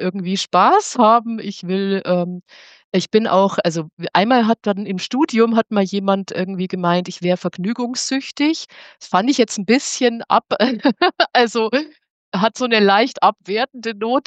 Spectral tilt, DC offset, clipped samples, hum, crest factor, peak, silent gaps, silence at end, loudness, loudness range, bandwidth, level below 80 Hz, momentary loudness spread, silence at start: -4.5 dB/octave; under 0.1%; under 0.1%; none; 16 dB; 0 dBFS; 2.84-2.92 s, 3.93-3.97 s, 12.10-12.32 s; 0.05 s; -18 LUFS; 3 LU; 9 kHz; -72 dBFS; 9 LU; 0 s